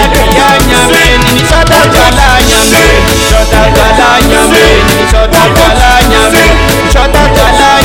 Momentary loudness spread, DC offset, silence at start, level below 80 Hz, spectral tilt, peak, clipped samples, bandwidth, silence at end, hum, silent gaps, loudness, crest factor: 3 LU; under 0.1%; 0 s; -12 dBFS; -3.5 dB/octave; 0 dBFS; 8%; 18 kHz; 0 s; none; none; -4 LUFS; 4 dB